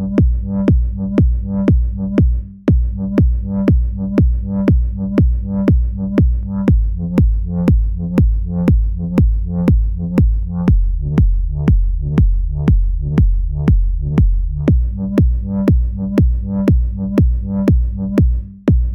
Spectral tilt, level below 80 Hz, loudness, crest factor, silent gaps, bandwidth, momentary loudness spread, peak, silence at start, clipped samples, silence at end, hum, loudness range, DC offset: -10.5 dB/octave; -16 dBFS; -16 LUFS; 14 dB; none; 3.5 kHz; 3 LU; 0 dBFS; 0 s; under 0.1%; 0 s; none; 0 LU; under 0.1%